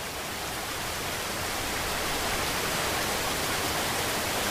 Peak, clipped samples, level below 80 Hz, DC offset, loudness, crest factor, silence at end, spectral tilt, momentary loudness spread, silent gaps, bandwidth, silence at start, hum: -16 dBFS; under 0.1%; -46 dBFS; under 0.1%; -28 LUFS; 14 dB; 0 s; -2 dB/octave; 5 LU; none; 16 kHz; 0 s; none